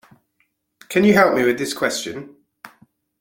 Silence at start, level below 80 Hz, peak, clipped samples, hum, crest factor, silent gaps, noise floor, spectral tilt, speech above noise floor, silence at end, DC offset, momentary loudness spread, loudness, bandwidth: 0.9 s; -58 dBFS; -2 dBFS; under 0.1%; none; 20 dB; none; -68 dBFS; -4.5 dB/octave; 51 dB; 0.55 s; under 0.1%; 15 LU; -18 LUFS; 17 kHz